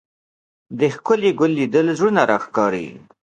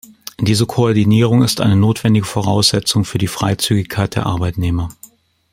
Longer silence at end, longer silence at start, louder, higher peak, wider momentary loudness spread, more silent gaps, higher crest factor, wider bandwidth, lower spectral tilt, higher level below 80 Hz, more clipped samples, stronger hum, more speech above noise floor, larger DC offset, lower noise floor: second, 0.25 s vs 0.6 s; first, 0.7 s vs 0.4 s; second, -18 LUFS vs -15 LUFS; about the same, 0 dBFS vs 0 dBFS; about the same, 9 LU vs 7 LU; neither; about the same, 18 dB vs 14 dB; second, 9.2 kHz vs 16.5 kHz; about the same, -6 dB/octave vs -5.5 dB/octave; second, -62 dBFS vs -42 dBFS; neither; neither; first, over 72 dB vs 31 dB; neither; first, under -90 dBFS vs -45 dBFS